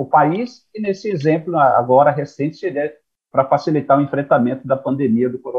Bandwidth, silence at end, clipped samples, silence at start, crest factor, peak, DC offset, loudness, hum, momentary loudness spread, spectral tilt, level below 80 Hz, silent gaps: 7.4 kHz; 0 s; under 0.1%; 0 s; 16 dB; -2 dBFS; under 0.1%; -17 LUFS; none; 10 LU; -8.5 dB/octave; -64 dBFS; none